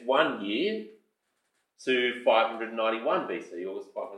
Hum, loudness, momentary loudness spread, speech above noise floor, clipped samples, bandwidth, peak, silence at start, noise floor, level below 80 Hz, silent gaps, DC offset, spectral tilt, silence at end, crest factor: none; -28 LUFS; 13 LU; 49 dB; under 0.1%; 10.5 kHz; -10 dBFS; 0 s; -77 dBFS; under -90 dBFS; none; under 0.1%; -4.5 dB/octave; 0 s; 20 dB